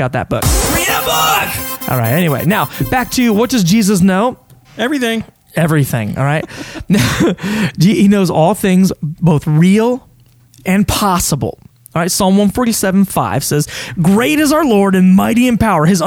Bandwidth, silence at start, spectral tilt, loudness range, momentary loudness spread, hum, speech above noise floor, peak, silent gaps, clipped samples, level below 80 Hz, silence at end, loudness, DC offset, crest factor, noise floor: over 20 kHz; 0 s; -5 dB/octave; 3 LU; 7 LU; none; 34 dB; 0 dBFS; none; under 0.1%; -32 dBFS; 0 s; -13 LUFS; under 0.1%; 12 dB; -46 dBFS